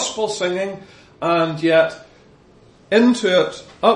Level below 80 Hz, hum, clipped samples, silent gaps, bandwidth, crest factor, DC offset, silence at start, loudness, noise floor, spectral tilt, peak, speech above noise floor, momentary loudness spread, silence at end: -60 dBFS; none; under 0.1%; none; 11 kHz; 18 dB; under 0.1%; 0 s; -18 LUFS; -49 dBFS; -4 dB/octave; 0 dBFS; 32 dB; 11 LU; 0 s